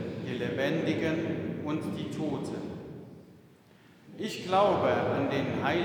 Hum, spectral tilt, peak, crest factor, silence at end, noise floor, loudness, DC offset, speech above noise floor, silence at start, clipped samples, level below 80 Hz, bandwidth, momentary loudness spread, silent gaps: none; -6.5 dB/octave; -12 dBFS; 20 dB; 0 s; -57 dBFS; -30 LUFS; under 0.1%; 28 dB; 0 s; under 0.1%; -66 dBFS; 19.5 kHz; 16 LU; none